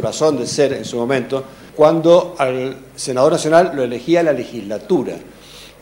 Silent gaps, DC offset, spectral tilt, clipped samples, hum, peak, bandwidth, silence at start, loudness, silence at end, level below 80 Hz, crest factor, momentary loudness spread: none; under 0.1%; -5 dB/octave; under 0.1%; none; 0 dBFS; 16.5 kHz; 0 s; -16 LUFS; 0.15 s; -54 dBFS; 16 dB; 14 LU